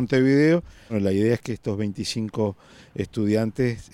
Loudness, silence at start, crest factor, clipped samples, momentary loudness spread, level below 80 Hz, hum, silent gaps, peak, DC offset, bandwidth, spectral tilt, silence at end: -24 LUFS; 0 s; 14 dB; under 0.1%; 11 LU; -54 dBFS; none; none; -8 dBFS; under 0.1%; 13.5 kHz; -6.5 dB/octave; 0.1 s